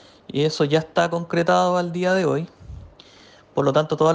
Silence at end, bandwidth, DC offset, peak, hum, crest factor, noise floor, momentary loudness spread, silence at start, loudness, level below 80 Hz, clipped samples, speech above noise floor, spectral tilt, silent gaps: 0 s; 9.6 kHz; under 0.1%; -6 dBFS; none; 16 dB; -49 dBFS; 15 LU; 0.35 s; -21 LUFS; -52 dBFS; under 0.1%; 30 dB; -6 dB/octave; none